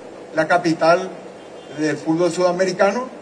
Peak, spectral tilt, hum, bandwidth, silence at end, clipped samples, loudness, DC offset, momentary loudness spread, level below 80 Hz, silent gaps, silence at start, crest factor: -4 dBFS; -5 dB/octave; none; 10.5 kHz; 0 s; under 0.1%; -19 LUFS; under 0.1%; 19 LU; -64 dBFS; none; 0 s; 16 dB